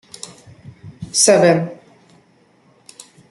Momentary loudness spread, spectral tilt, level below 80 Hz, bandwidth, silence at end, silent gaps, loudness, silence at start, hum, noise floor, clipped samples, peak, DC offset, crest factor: 25 LU; -3.5 dB/octave; -60 dBFS; 12 kHz; 1.55 s; none; -14 LUFS; 0.85 s; none; -54 dBFS; under 0.1%; 0 dBFS; under 0.1%; 20 dB